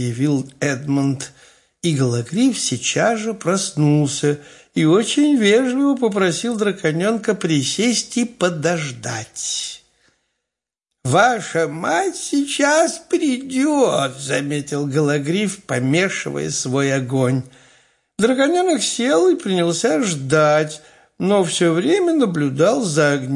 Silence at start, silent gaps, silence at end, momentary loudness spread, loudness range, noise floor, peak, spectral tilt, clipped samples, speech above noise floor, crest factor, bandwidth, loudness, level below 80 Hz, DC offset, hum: 0 s; none; 0 s; 8 LU; 4 LU; -84 dBFS; -2 dBFS; -4.5 dB/octave; under 0.1%; 66 dB; 16 dB; 11.5 kHz; -18 LUFS; -62 dBFS; under 0.1%; none